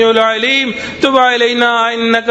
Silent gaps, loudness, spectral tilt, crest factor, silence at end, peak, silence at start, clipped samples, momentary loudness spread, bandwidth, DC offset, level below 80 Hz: none; -11 LUFS; -3 dB/octave; 12 dB; 0 s; 0 dBFS; 0 s; under 0.1%; 4 LU; 9.8 kHz; under 0.1%; -50 dBFS